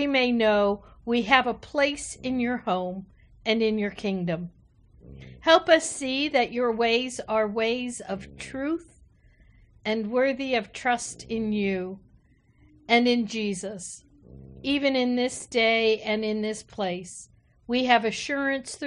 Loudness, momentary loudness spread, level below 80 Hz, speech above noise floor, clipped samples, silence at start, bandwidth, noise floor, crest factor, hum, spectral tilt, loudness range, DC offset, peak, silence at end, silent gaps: -25 LUFS; 14 LU; -56 dBFS; 34 dB; under 0.1%; 0 s; 10.5 kHz; -59 dBFS; 24 dB; none; -4 dB/octave; 5 LU; under 0.1%; -4 dBFS; 0 s; none